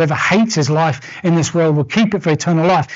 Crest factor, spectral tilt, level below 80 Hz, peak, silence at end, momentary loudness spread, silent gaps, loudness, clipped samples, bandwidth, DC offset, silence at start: 10 dB; -5.5 dB/octave; -52 dBFS; -4 dBFS; 0 s; 3 LU; none; -15 LUFS; under 0.1%; 8 kHz; under 0.1%; 0 s